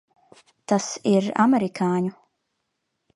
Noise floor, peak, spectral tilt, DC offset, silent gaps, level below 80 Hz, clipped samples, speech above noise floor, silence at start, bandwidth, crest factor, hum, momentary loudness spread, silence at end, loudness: -77 dBFS; -4 dBFS; -5.5 dB/octave; under 0.1%; none; -72 dBFS; under 0.1%; 56 dB; 0.7 s; 11.5 kHz; 20 dB; none; 8 LU; 1.05 s; -22 LUFS